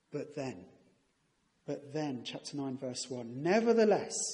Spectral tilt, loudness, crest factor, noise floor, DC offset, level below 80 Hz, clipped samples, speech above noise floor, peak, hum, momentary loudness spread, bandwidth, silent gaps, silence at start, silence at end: -4.5 dB/octave; -34 LUFS; 18 dB; -75 dBFS; under 0.1%; -80 dBFS; under 0.1%; 42 dB; -16 dBFS; none; 16 LU; 11.5 kHz; none; 0.1 s; 0 s